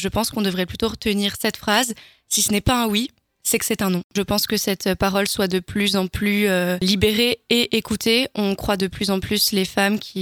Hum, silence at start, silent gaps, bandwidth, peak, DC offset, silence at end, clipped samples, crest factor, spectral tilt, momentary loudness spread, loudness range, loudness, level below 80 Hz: none; 0 s; 4.04-4.10 s; 19.5 kHz; 0 dBFS; under 0.1%; 0 s; under 0.1%; 20 dB; -3.5 dB/octave; 5 LU; 2 LU; -20 LUFS; -42 dBFS